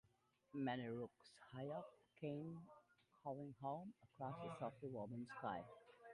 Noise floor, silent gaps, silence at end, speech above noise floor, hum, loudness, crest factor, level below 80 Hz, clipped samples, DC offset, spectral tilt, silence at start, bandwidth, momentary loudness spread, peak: -81 dBFS; none; 0 s; 30 dB; none; -52 LUFS; 18 dB; -84 dBFS; under 0.1%; under 0.1%; -7.5 dB/octave; 0.55 s; 11 kHz; 13 LU; -34 dBFS